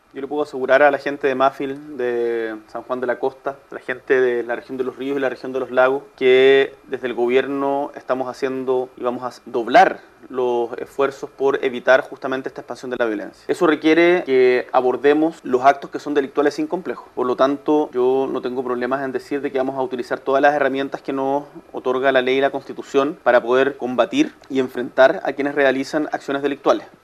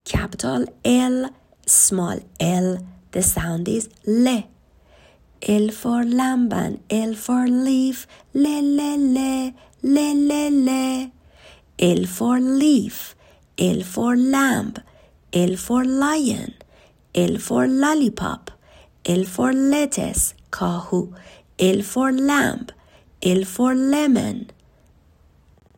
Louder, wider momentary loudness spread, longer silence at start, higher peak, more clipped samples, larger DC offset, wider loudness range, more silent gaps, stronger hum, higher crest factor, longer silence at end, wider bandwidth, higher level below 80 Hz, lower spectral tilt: about the same, -19 LUFS vs -20 LUFS; about the same, 11 LU vs 12 LU; about the same, 0.15 s vs 0.05 s; about the same, 0 dBFS vs -2 dBFS; neither; neither; about the same, 4 LU vs 3 LU; neither; neither; about the same, 20 dB vs 18 dB; second, 0.2 s vs 1.35 s; second, 12.5 kHz vs 16.5 kHz; second, -64 dBFS vs -46 dBFS; about the same, -5 dB/octave vs -4.5 dB/octave